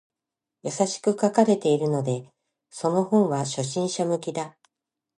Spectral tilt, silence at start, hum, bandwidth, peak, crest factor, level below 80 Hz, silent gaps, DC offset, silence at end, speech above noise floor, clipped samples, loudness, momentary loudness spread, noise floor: -5.5 dB/octave; 0.65 s; none; 11.5 kHz; -4 dBFS; 20 dB; -72 dBFS; none; under 0.1%; 0.7 s; 64 dB; under 0.1%; -24 LUFS; 13 LU; -87 dBFS